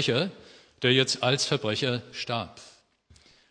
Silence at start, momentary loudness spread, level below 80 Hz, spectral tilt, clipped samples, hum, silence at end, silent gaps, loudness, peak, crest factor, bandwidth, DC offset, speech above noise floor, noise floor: 0 s; 10 LU; -66 dBFS; -4 dB/octave; under 0.1%; none; 0.8 s; none; -26 LUFS; -6 dBFS; 22 dB; 10.5 kHz; under 0.1%; 33 dB; -60 dBFS